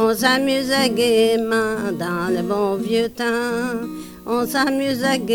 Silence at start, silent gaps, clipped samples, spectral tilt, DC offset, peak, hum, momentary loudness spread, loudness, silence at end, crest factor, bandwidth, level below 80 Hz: 0 s; none; under 0.1%; -4 dB/octave; under 0.1%; -4 dBFS; none; 7 LU; -19 LUFS; 0 s; 16 dB; 19.5 kHz; -52 dBFS